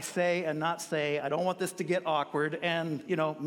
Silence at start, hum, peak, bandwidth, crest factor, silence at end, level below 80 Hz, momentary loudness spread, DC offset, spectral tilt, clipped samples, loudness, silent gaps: 0 s; none; -16 dBFS; 17 kHz; 16 dB; 0 s; -78 dBFS; 3 LU; under 0.1%; -4.5 dB/octave; under 0.1%; -31 LUFS; none